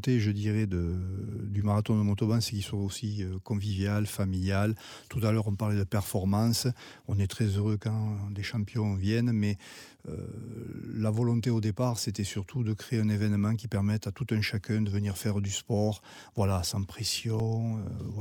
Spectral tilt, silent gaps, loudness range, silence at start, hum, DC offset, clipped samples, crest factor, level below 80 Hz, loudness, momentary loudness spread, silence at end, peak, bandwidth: -6 dB/octave; none; 2 LU; 0 s; none; under 0.1%; under 0.1%; 14 dB; -54 dBFS; -30 LUFS; 9 LU; 0 s; -16 dBFS; 18 kHz